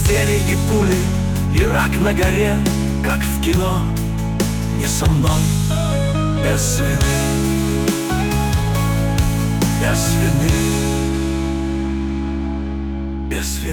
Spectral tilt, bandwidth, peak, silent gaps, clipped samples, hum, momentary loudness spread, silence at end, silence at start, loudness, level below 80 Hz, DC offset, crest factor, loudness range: -5.5 dB/octave; 19.5 kHz; -6 dBFS; none; under 0.1%; none; 6 LU; 0 s; 0 s; -18 LUFS; -24 dBFS; under 0.1%; 12 dB; 2 LU